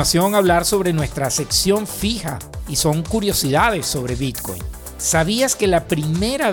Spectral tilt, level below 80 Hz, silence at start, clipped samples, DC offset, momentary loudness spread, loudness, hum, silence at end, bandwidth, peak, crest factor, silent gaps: -4 dB/octave; -34 dBFS; 0 s; under 0.1%; under 0.1%; 9 LU; -18 LUFS; none; 0 s; over 20 kHz; -4 dBFS; 16 dB; none